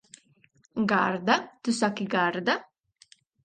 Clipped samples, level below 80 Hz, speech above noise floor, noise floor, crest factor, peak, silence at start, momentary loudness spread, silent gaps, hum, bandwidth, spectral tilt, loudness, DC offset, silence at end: under 0.1%; -72 dBFS; 38 dB; -64 dBFS; 22 dB; -8 dBFS; 0.75 s; 6 LU; none; none; 9.6 kHz; -4.5 dB/octave; -27 LUFS; under 0.1%; 0.85 s